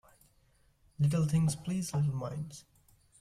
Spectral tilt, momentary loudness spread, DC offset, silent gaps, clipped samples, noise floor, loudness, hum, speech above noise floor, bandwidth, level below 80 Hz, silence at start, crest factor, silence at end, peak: -6.5 dB/octave; 14 LU; under 0.1%; none; under 0.1%; -68 dBFS; -32 LUFS; none; 37 dB; 14.5 kHz; -60 dBFS; 1 s; 14 dB; 0.6 s; -20 dBFS